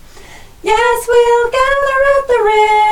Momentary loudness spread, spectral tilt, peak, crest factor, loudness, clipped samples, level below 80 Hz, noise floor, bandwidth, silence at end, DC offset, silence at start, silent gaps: 3 LU; -2 dB/octave; 0 dBFS; 12 dB; -11 LUFS; under 0.1%; -36 dBFS; -35 dBFS; 16 kHz; 0 s; under 0.1%; 0.15 s; none